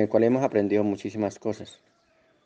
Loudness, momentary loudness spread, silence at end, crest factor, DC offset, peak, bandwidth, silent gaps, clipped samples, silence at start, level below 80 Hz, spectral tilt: -25 LUFS; 14 LU; 0.75 s; 18 dB; under 0.1%; -8 dBFS; 8.8 kHz; none; under 0.1%; 0 s; -70 dBFS; -7.5 dB/octave